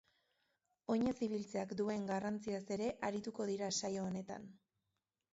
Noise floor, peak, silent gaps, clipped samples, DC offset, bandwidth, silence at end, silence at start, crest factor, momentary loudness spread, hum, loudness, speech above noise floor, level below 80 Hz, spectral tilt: -89 dBFS; -26 dBFS; none; under 0.1%; under 0.1%; 8 kHz; 0.75 s; 0.9 s; 16 dB; 9 LU; none; -41 LUFS; 49 dB; -74 dBFS; -5 dB/octave